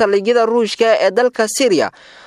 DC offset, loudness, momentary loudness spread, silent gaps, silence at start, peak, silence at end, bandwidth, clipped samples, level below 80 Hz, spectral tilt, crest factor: under 0.1%; -14 LUFS; 3 LU; none; 0 s; -2 dBFS; 0.4 s; 15 kHz; under 0.1%; -66 dBFS; -3 dB/octave; 14 dB